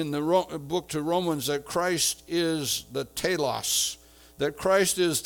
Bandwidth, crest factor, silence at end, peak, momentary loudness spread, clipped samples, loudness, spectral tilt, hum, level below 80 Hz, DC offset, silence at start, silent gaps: 19.5 kHz; 18 dB; 0 s; -10 dBFS; 8 LU; under 0.1%; -26 LUFS; -3 dB/octave; none; -58 dBFS; under 0.1%; 0 s; none